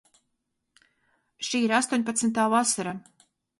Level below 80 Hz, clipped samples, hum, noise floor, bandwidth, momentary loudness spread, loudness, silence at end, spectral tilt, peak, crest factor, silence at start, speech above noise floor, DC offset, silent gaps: -72 dBFS; under 0.1%; none; -79 dBFS; 11.5 kHz; 12 LU; -25 LUFS; 0.6 s; -3 dB/octave; -8 dBFS; 20 dB; 1.4 s; 54 dB; under 0.1%; none